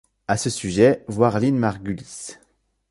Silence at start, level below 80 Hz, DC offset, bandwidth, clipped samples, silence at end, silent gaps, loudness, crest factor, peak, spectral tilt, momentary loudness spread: 0.3 s; -50 dBFS; under 0.1%; 11.5 kHz; under 0.1%; 0.55 s; none; -21 LUFS; 20 dB; -2 dBFS; -5.5 dB/octave; 17 LU